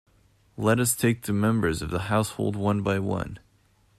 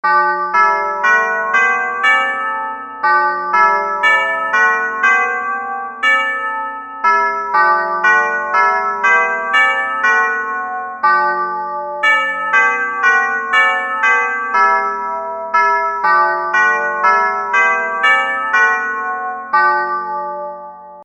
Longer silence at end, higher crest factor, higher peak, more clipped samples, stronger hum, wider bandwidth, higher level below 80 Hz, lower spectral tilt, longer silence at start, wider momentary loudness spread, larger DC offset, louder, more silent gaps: first, 0.6 s vs 0 s; about the same, 18 dB vs 14 dB; second, -8 dBFS vs 0 dBFS; neither; neither; first, 14 kHz vs 8.4 kHz; first, -50 dBFS vs -62 dBFS; first, -5.5 dB/octave vs -2 dB/octave; first, 0.6 s vs 0.05 s; about the same, 7 LU vs 9 LU; neither; second, -25 LUFS vs -14 LUFS; neither